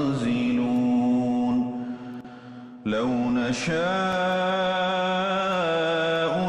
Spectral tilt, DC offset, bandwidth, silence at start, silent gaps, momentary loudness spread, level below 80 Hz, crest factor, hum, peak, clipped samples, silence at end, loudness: -5.5 dB/octave; under 0.1%; 9.8 kHz; 0 s; none; 12 LU; -58 dBFS; 10 dB; none; -14 dBFS; under 0.1%; 0 s; -24 LUFS